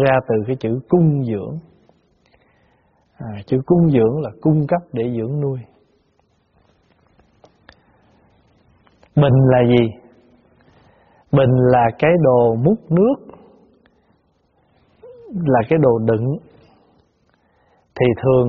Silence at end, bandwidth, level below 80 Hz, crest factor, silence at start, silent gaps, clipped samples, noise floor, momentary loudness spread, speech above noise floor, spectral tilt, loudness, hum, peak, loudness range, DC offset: 0 s; 4.9 kHz; -48 dBFS; 18 dB; 0 s; none; under 0.1%; -61 dBFS; 13 LU; 46 dB; -8 dB/octave; -17 LUFS; none; 0 dBFS; 7 LU; under 0.1%